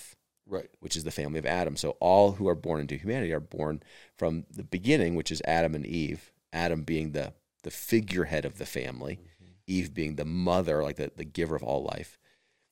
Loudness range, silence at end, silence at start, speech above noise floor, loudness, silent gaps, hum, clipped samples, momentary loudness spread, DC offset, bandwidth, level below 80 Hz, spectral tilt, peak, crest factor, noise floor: 4 LU; 0.6 s; 0 s; 40 dB; -30 LUFS; none; none; under 0.1%; 14 LU; 0.2%; 17 kHz; -54 dBFS; -5.5 dB/octave; -8 dBFS; 22 dB; -69 dBFS